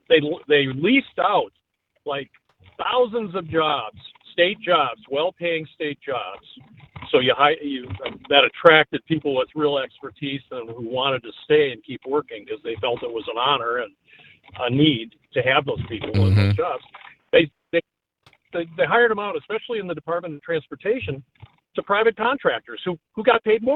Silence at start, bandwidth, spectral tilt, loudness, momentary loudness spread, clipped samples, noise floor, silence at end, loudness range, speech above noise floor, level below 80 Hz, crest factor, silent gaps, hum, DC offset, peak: 0.1 s; 5.2 kHz; -7.5 dB/octave; -22 LUFS; 14 LU; under 0.1%; -60 dBFS; 0 s; 5 LU; 39 dB; -60 dBFS; 22 dB; none; none; under 0.1%; 0 dBFS